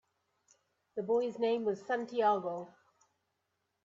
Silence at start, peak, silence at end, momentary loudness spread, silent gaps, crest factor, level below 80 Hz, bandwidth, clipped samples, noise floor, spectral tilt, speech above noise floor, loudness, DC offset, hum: 0.95 s; -18 dBFS; 1.15 s; 14 LU; none; 18 dB; -82 dBFS; 7.6 kHz; under 0.1%; -83 dBFS; -6 dB/octave; 50 dB; -34 LUFS; under 0.1%; none